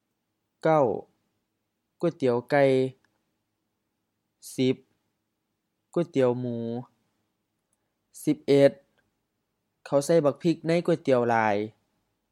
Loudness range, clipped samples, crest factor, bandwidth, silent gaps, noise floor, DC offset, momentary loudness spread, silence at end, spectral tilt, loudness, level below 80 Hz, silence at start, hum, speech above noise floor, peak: 7 LU; under 0.1%; 22 dB; 14 kHz; none; -80 dBFS; under 0.1%; 11 LU; 0.6 s; -6.5 dB/octave; -25 LUFS; -78 dBFS; 0.65 s; none; 56 dB; -6 dBFS